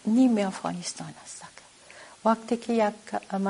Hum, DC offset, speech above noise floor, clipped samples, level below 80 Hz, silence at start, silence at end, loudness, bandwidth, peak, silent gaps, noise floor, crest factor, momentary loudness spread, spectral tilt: none; under 0.1%; 23 dB; under 0.1%; -70 dBFS; 0.05 s; 0 s; -27 LUFS; 11 kHz; -10 dBFS; none; -50 dBFS; 18 dB; 21 LU; -5.5 dB/octave